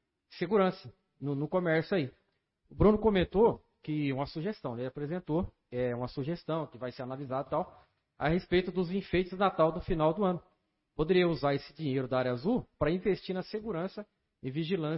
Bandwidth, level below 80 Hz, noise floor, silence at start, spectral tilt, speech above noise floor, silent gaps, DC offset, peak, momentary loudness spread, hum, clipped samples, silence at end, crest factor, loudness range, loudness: 5.8 kHz; -50 dBFS; -71 dBFS; 0.3 s; -10.5 dB/octave; 40 dB; none; under 0.1%; -12 dBFS; 12 LU; none; under 0.1%; 0 s; 20 dB; 6 LU; -32 LUFS